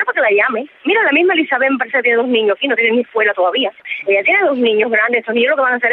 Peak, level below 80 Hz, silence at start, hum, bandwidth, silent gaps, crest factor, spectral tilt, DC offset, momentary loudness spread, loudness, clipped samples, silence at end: 0 dBFS; -78 dBFS; 0 s; none; 4.2 kHz; none; 14 dB; -6.5 dB/octave; under 0.1%; 4 LU; -14 LUFS; under 0.1%; 0 s